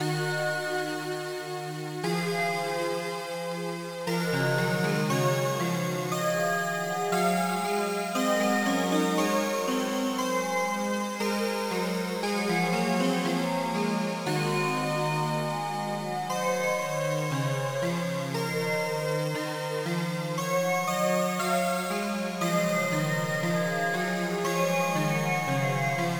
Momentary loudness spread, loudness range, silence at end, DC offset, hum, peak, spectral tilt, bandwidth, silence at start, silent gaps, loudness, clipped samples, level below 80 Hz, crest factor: 5 LU; 3 LU; 0 s; under 0.1%; none; -14 dBFS; -5 dB/octave; over 20 kHz; 0 s; none; -28 LUFS; under 0.1%; -76 dBFS; 14 dB